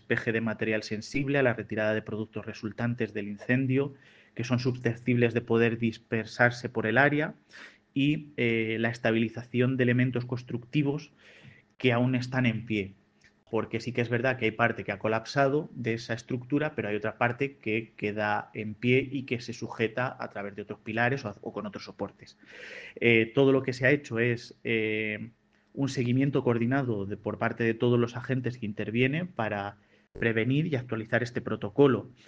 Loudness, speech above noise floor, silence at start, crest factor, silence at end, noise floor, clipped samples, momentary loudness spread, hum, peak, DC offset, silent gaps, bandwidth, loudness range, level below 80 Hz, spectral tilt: -29 LUFS; 34 dB; 0.1 s; 22 dB; 0.15 s; -63 dBFS; under 0.1%; 12 LU; none; -6 dBFS; under 0.1%; none; 8 kHz; 4 LU; -64 dBFS; -7 dB/octave